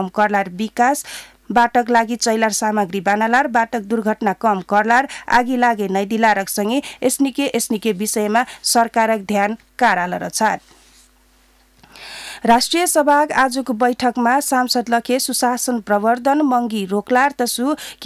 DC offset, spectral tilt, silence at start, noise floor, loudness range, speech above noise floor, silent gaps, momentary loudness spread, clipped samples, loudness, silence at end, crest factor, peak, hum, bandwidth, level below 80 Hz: under 0.1%; -3 dB/octave; 0 s; -54 dBFS; 3 LU; 37 dB; none; 6 LU; under 0.1%; -17 LUFS; 0 s; 12 dB; -4 dBFS; none; 16 kHz; -56 dBFS